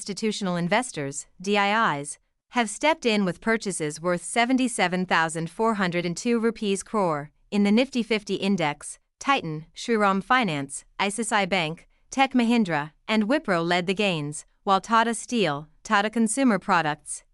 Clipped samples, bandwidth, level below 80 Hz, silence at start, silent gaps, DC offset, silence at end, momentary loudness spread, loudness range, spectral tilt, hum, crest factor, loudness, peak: under 0.1%; 12 kHz; -60 dBFS; 0 s; none; under 0.1%; 0.15 s; 10 LU; 1 LU; -4 dB/octave; none; 18 dB; -24 LUFS; -8 dBFS